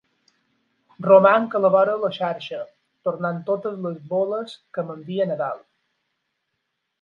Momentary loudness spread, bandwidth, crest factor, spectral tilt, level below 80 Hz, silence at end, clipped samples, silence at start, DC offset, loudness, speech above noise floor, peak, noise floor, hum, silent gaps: 16 LU; 5.6 kHz; 22 dB; -8 dB/octave; -76 dBFS; 1.45 s; under 0.1%; 1 s; under 0.1%; -21 LUFS; 56 dB; -2 dBFS; -77 dBFS; none; none